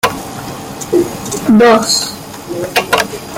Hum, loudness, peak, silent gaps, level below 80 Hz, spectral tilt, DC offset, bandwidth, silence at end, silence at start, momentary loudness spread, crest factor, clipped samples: none; -12 LUFS; 0 dBFS; none; -44 dBFS; -3.5 dB/octave; under 0.1%; 17 kHz; 0 s; 0.05 s; 17 LU; 14 dB; under 0.1%